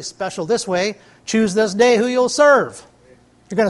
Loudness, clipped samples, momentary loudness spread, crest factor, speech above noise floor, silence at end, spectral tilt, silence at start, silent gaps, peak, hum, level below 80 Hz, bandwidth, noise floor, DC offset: -17 LUFS; under 0.1%; 13 LU; 16 dB; 33 dB; 0 s; -4 dB/octave; 0 s; none; -2 dBFS; none; -58 dBFS; 11.5 kHz; -50 dBFS; under 0.1%